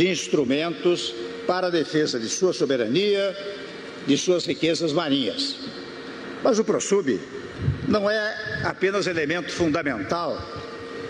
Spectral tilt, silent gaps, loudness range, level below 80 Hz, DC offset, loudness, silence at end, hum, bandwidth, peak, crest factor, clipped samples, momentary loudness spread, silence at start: -4.5 dB/octave; none; 2 LU; -52 dBFS; under 0.1%; -24 LUFS; 0 s; none; 10.5 kHz; -8 dBFS; 16 dB; under 0.1%; 13 LU; 0 s